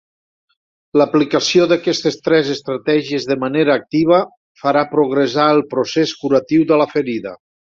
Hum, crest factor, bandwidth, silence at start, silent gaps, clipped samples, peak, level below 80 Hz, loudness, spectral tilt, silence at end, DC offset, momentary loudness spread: none; 14 dB; 7.6 kHz; 0.95 s; 4.37-4.55 s; under 0.1%; -2 dBFS; -60 dBFS; -16 LUFS; -5 dB/octave; 0.4 s; under 0.1%; 7 LU